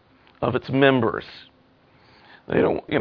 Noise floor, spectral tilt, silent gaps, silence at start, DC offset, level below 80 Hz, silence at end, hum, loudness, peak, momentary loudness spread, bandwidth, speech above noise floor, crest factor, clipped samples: -57 dBFS; -9 dB/octave; none; 0.4 s; under 0.1%; -54 dBFS; 0 s; none; -22 LUFS; -2 dBFS; 12 LU; 5.4 kHz; 36 dB; 22 dB; under 0.1%